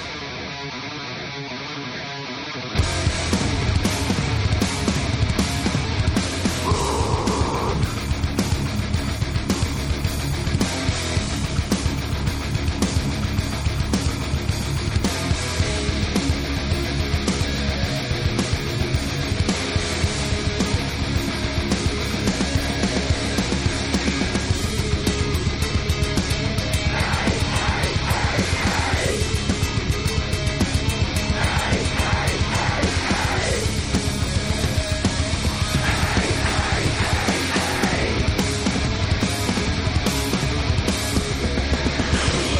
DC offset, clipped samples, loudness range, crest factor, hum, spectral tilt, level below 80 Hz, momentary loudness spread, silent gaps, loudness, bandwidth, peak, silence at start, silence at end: under 0.1%; under 0.1%; 2 LU; 14 dB; none; -4.5 dB/octave; -28 dBFS; 4 LU; none; -22 LUFS; 16.5 kHz; -8 dBFS; 0 s; 0 s